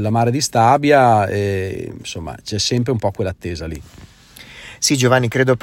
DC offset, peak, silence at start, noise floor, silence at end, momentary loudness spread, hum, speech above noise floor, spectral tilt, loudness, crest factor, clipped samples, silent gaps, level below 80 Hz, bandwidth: under 0.1%; 0 dBFS; 0 s; -41 dBFS; 0.05 s; 16 LU; none; 24 dB; -4.5 dB/octave; -16 LUFS; 16 dB; under 0.1%; none; -44 dBFS; 16.5 kHz